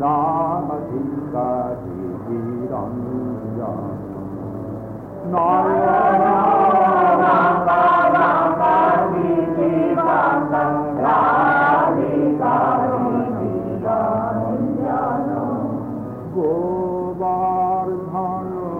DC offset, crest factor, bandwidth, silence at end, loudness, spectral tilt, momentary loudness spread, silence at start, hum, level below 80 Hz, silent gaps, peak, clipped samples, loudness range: under 0.1%; 12 dB; 4.8 kHz; 0 s; -18 LUFS; -9.5 dB/octave; 12 LU; 0 s; none; -50 dBFS; none; -6 dBFS; under 0.1%; 10 LU